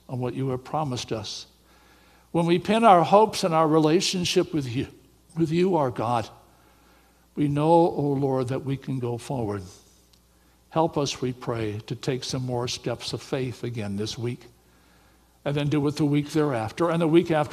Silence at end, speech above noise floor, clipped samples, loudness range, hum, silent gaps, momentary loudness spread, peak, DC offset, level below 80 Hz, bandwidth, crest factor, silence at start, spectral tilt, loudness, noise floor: 0 s; 36 dB; under 0.1%; 9 LU; none; none; 12 LU; -2 dBFS; under 0.1%; -58 dBFS; 14.5 kHz; 22 dB; 0.1 s; -6 dB/octave; -25 LUFS; -59 dBFS